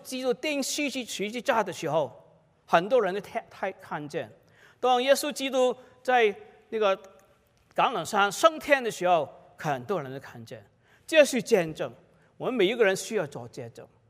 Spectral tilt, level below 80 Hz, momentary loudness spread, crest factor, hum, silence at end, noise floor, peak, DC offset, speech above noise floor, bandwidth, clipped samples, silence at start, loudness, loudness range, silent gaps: -3.5 dB/octave; -72 dBFS; 16 LU; 22 dB; none; 0.25 s; -63 dBFS; -6 dBFS; under 0.1%; 36 dB; 16 kHz; under 0.1%; 0.05 s; -27 LUFS; 3 LU; none